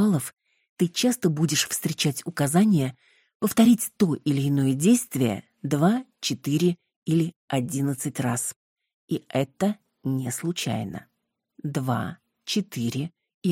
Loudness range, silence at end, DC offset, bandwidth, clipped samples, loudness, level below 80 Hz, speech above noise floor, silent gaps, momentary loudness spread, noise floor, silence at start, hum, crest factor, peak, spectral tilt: 7 LU; 0 s; under 0.1%; 17 kHz; under 0.1%; -25 LUFS; -64 dBFS; 32 dB; 0.69-0.77 s, 3.35-3.40 s, 6.96-7.02 s, 7.36-7.48 s, 8.56-8.76 s, 8.94-9.08 s, 13.34-13.41 s; 12 LU; -56 dBFS; 0 s; none; 18 dB; -8 dBFS; -5 dB/octave